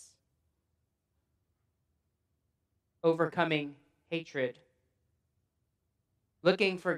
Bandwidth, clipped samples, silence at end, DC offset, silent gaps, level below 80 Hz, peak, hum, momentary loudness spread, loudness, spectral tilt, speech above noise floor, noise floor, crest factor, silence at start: 11 kHz; under 0.1%; 0 s; under 0.1%; none; -84 dBFS; -12 dBFS; none; 11 LU; -32 LUFS; -6 dB/octave; 50 dB; -81 dBFS; 24 dB; 3.05 s